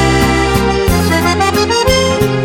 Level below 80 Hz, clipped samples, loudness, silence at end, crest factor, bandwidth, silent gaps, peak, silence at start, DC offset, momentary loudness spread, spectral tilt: -22 dBFS; under 0.1%; -11 LUFS; 0 s; 12 dB; 17.5 kHz; none; 0 dBFS; 0 s; under 0.1%; 2 LU; -4.5 dB/octave